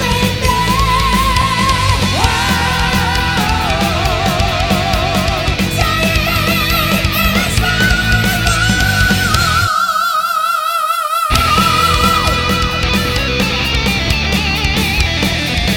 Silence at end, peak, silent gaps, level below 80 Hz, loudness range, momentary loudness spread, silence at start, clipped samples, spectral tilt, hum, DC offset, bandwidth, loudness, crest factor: 0 s; 0 dBFS; none; -22 dBFS; 2 LU; 3 LU; 0 s; under 0.1%; -4 dB/octave; none; under 0.1%; 19 kHz; -13 LUFS; 14 dB